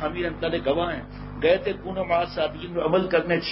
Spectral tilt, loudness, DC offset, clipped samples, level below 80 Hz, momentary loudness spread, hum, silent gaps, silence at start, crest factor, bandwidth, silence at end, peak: -10 dB/octave; -25 LUFS; under 0.1%; under 0.1%; -44 dBFS; 7 LU; 50 Hz at -40 dBFS; none; 0 s; 18 dB; 5.8 kHz; 0 s; -8 dBFS